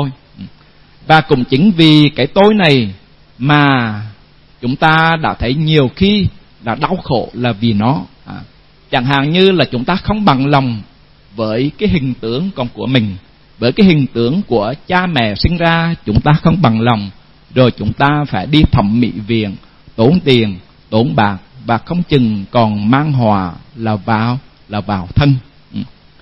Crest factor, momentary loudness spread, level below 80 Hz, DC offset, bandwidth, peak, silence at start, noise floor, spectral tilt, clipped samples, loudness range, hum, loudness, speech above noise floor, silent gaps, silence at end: 14 dB; 14 LU; -34 dBFS; 0.2%; 7.6 kHz; 0 dBFS; 0 s; -44 dBFS; -8 dB/octave; 0.1%; 4 LU; none; -13 LUFS; 32 dB; none; 0.35 s